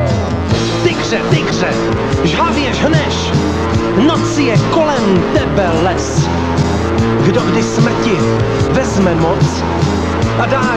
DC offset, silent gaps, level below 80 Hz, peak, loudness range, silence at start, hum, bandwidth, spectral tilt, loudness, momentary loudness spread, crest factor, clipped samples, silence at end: under 0.1%; none; -28 dBFS; 0 dBFS; 1 LU; 0 s; none; 11 kHz; -6 dB/octave; -13 LUFS; 3 LU; 12 dB; under 0.1%; 0 s